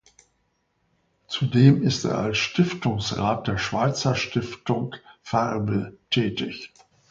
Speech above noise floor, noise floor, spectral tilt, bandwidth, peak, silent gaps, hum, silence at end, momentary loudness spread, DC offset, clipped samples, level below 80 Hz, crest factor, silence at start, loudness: 48 dB; -71 dBFS; -6 dB/octave; 7.6 kHz; -4 dBFS; none; none; 0.45 s; 14 LU; under 0.1%; under 0.1%; -52 dBFS; 22 dB; 1.3 s; -24 LUFS